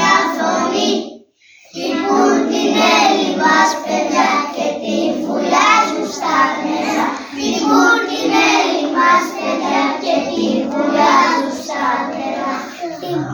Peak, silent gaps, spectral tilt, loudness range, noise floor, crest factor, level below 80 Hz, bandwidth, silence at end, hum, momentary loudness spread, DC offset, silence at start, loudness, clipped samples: 0 dBFS; none; -3 dB/octave; 2 LU; -47 dBFS; 16 dB; -62 dBFS; over 20 kHz; 0 s; none; 10 LU; under 0.1%; 0 s; -15 LUFS; under 0.1%